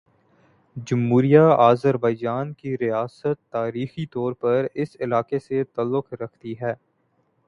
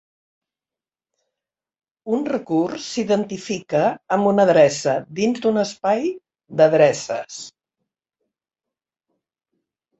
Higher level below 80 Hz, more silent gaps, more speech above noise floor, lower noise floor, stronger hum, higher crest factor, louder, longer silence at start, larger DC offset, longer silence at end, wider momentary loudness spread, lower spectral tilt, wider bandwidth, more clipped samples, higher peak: about the same, -62 dBFS vs -66 dBFS; neither; second, 46 dB vs over 71 dB; second, -67 dBFS vs under -90 dBFS; neither; about the same, 22 dB vs 20 dB; about the same, -22 LUFS vs -20 LUFS; second, 0.75 s vs 2.05 s; neither; second, 0.75 s vs 2.5 s; about the same, 15 LU vs 14 LU; first, -8.5 dB/octave vs -5 dB/octave; second, 7.2 kHz vs 8.2 kHz; neither; about the same, -2 dBFS vs -2 dBFS